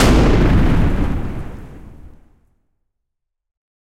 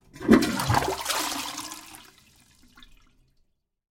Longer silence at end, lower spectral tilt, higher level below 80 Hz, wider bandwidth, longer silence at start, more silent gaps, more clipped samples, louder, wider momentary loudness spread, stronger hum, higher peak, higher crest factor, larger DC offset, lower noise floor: second, 1.85 s vs 2.05 s; first, -6.5 dB/octave vs -4 dB/octave; first, -20 dBFS vs -50 dBFS; second, 15 kHz vs 17 kHz; second, 0 s vs 0.15 s; neither; neither; first, -16 LUFS vs -24 LUFS; first, 22 LU vs 18 LU; neither; about the same, -2 dBFS vs -4 dBFS; second, 14 dB vs 24 dB; neither; first, -76 dBFS vs -69 dBFS